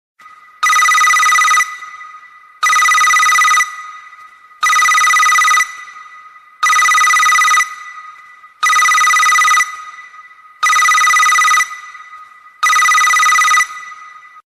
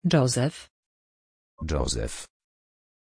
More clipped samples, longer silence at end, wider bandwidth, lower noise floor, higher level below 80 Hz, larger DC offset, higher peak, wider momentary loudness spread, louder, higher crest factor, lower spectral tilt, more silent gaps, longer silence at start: neither; second, 0.4 s vs 0.9 s; first, 15.5 kHz vs 10.5 kHz; second, -40 dBFS vs under -90 dBFS; second, -58 dBFS vs -40 dBFS; neither; first, -2 dBFS vs -8 dBFS; about the same, 20 LU vs 20 LU; first, -10 LUFS vs -27 LUFS; second, 12 dB vs 20 dB; second, 4.5 dB/octave vs -5 dB/octave; second, none vs 0.70-1.58 s; first, 0.6 s vs 0.05 s